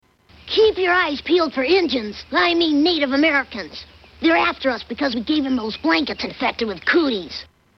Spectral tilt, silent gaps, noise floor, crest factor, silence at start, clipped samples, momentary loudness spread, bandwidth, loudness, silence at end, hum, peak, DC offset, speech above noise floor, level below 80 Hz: -4.5 dB/octave; none; -45 dBFS; 14 dB; 0.45 s; under 0.1%; 9 LU; 6.4 kHz; -19 LUFS; 0.35 s; none; -6 dBFS; under 0.1%; 26 dB; -50 dBFS